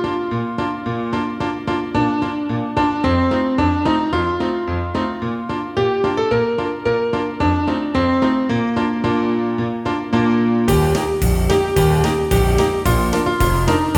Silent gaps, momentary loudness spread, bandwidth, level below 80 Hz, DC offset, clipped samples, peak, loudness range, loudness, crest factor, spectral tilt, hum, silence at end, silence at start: none; 7 LU; 19 kHz; -28 dBFS; under 0.1%; under 0.1%; -2 dBFS; 3 LU; -19 LUFS; 16 dB; -6.5 dB/octave; none; 0 s; 0 s